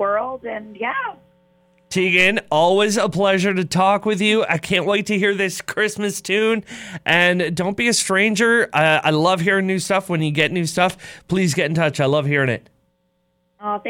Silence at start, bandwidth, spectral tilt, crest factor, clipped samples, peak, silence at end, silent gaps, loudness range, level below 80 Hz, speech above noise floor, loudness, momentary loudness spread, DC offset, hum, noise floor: 0 s; 17 kHz; -4.5 dB/octave; 16 dB; under 0.1%; -4 dBFS; 0 s; none; 3 LU; -56 dBFS; 48 dB; -18 LUFS; 10 LU; under 0.1%; none; -66 dBFS